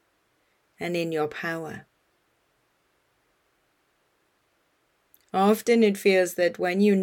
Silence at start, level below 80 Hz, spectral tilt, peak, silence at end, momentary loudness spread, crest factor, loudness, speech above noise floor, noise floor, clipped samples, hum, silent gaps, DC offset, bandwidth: 0.8 s; -74 dBFS; -5.5 dB/octave; -8 dBFS; 0 s; 14 LU; 18 dB; -24 LUFS; 47 dB; -70 dBFS; under 0.1%; none; none; under 0.1%; 18 kHz